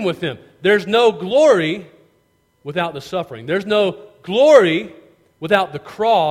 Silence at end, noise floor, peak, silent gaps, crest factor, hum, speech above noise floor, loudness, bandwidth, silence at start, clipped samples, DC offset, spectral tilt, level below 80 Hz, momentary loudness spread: 0 s; -61 dBFS; 0 dBFS; none; 18 dB; none; 45 dB; -17 LUFS; 14 kHz; 0 s; under 0.1%; under 0.1%; -5 dB/octave; -60 dBFS; 15 LU